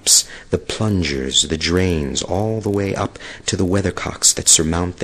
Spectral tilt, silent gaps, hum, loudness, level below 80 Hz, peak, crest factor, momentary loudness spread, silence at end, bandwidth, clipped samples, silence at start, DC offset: -3 dB/octave; none; none; -17 LUFS; -36 dBFS; 0 dBFS; 18 dB; 11 LU; 0 s; 13 kHz; under 0.1%; 0.05 s; under 0.1%